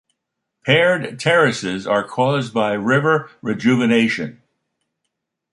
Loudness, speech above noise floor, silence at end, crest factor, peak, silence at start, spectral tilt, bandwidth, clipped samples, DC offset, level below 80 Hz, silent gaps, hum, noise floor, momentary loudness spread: -18 LUFS; 61 dB; 1.2 s; 18 dB; -2 dBFS; 0.65 s; -5.5 dB/octave; 11 kHz; under 0.1%; under 0.1%; -60 dBFS; none; none; -78 dBFS; 9 LU